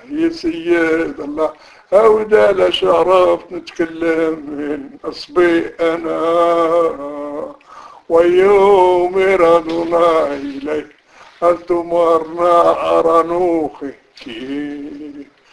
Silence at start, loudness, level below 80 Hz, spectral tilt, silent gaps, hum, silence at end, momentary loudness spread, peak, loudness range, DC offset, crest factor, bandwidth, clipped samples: 0.1 s; -14 LUFS; -48 dBFS; -5.5 dB/octave; none; none; 0.3 s; 15 LU; 0 dBFS; 4 LU; under 0.1%; 14 dB; 11 kHz; under 0.1%